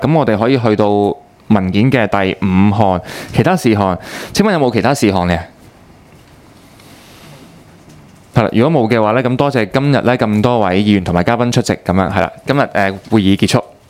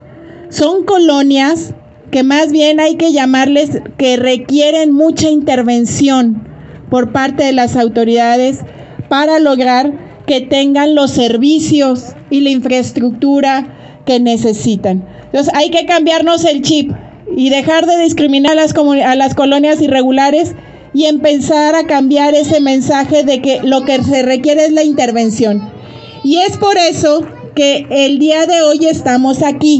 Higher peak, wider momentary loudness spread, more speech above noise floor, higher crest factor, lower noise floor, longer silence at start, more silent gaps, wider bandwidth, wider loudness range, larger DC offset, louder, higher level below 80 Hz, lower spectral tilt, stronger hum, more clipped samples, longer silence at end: about the same, 0 dBFS vs 0 dBFS; about the same, 5 LU vs 7 LU; first, 29 dB vs 23 dB; about the same, 14 dB vs 10 dB; first, -42 dBFS vs -32 dBFS; about the same, 0 s vs 0.1 s; neither; first, 16 kHz vs 8.6 kHz; first, 7 LU vs 2 LU; neither; second, -13 LUFS vs -10 LUFS; first, -42 dBFS vs -50 dBFS; first, -6.5 dB/octave vs -4.5 dB/octave; neither; neither; first, 0.25 s vs 0 s